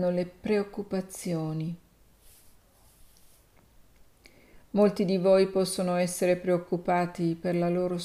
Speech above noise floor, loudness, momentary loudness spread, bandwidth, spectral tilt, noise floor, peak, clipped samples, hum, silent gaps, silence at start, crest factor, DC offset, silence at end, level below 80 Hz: 32 dB; -28 LUFS; 10 LU; 15.5 kHz; -6 dB/octave; -59 dBFS; -12 dBFS; under 0.1%; none; none; 0 s; 18 dB; under 0.1%; 0 s; -62 dBFS